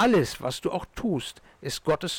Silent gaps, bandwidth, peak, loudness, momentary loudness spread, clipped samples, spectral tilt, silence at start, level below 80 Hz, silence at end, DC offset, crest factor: none; 18.5 kHz; -16 dBFS; -28 LUFS; 12 LU; under 0.1%; -5 dB/octave; 0 s; -50 dBFS; 0 s; under 0.1%; 12 dB